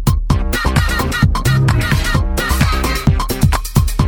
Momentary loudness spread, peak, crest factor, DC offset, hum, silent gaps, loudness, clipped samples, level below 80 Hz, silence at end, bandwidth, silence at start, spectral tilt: 3 LU; 0 dBFS; 14 dB; under 0.1%; none; none; -15 LUFS; 0.1%; -18 dBFS; 0 s; over 20 kHz; 0 s; -5 dB/octave